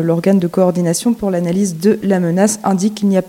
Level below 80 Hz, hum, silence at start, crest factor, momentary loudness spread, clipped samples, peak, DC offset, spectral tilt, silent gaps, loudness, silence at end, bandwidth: -52 dBFS; none; 0 s; 14 dB; 3 LU; under 0.1%; 0 dBFS; under 0.1%; -6 dB/octave; none; -15 LUFS; 0 s; 16.5 kHz